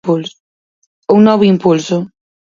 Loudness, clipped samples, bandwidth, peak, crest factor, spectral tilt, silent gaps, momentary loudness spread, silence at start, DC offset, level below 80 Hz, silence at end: -12 LUFS; under 0.1%; 7.6 kHz; 0 dBFS; 14 dB; -7 dB/octave; 0.40-1.02 s; 19 LU; 0.05 s; under 0.1%; -56 dBFS; 0.45 s